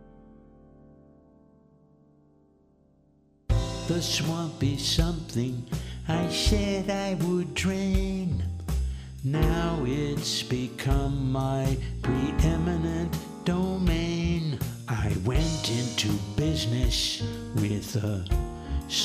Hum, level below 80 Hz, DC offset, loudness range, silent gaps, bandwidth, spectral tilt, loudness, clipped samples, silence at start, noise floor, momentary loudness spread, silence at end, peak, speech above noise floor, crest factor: none; -34 dBFS; under 0.1%; 2 LU; none; 15.5 kHz; -5 dB/octave; -28 LUFS; under 0.1%; 0 s; -62 dBFS; 6 LU; 0 s; -10 dBFS; 36 dB; 18 dB